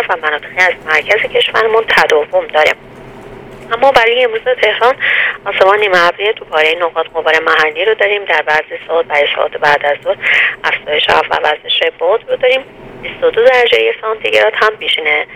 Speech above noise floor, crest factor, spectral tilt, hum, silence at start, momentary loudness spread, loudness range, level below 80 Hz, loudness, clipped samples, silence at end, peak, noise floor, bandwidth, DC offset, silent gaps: 20 dB; 12 dB; -2.5 dB/octave; none; 0 s; 6 LU; 1 LU; -48 dBFS; -11 LUFS; 0.2%; 0 s; 0 dBFS; -32 dBFS; 16.5 kHz; under 0.1%; none